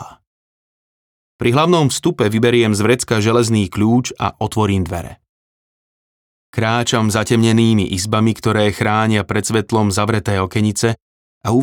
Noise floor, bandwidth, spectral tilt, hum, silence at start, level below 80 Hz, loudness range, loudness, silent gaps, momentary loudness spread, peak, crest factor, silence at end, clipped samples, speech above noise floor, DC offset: under -90 dBFS; 17.5 kHz; -5.5 dB/octave; none; 0 s; -48 dBFS; 5 LU; -16 LUFS; 0.27-1.39 s, 5.29-6.53 s, 11.02-11.41 s; 7 LU; -2 dBFS; 14 dB; 0 s; under 0.1%; over 75 dB; under 0.1%